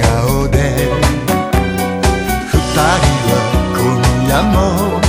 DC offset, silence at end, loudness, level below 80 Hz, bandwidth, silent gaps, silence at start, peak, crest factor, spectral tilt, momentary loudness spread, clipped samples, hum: under 0.1%; 0 s; -13 LUFS; -20 dBFS; 16.5 kHz; none; 0 s; 0 dBFS; 12 dB; -5.5 dB/octave; 3 LU; under 0.1%; none